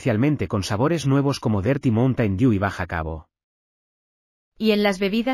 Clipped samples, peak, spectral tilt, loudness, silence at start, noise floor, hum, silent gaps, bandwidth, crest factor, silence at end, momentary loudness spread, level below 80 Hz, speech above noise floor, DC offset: under 0.1%; -6 dBFS; -7 dB/octave; -21 LUFS; 0 s; under -90 dBFS; none; 3.44-4.52 s; 14.5 kHz; 16 dB; 0 s; 8 LU; -46 dBFS; over 69 dB; under 0.1%